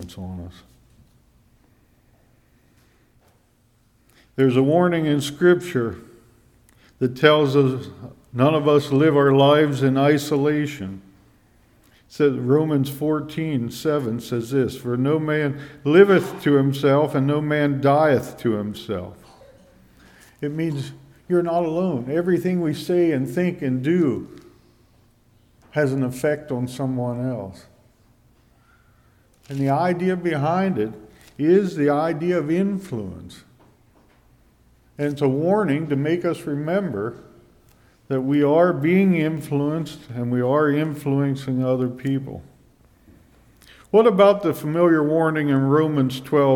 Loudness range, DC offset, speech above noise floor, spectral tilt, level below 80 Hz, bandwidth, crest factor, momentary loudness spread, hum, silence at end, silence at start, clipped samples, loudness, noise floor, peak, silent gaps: 8 LU; under 0.1%; 40 dB; -7.5 dB/octave; -58 dBFS; 17.5 kHz; 20 dB; 13 LU; none; 0 s; 0 s; under 0.1%; -20 LUFS; -60 dBFS; 0 dBFS; none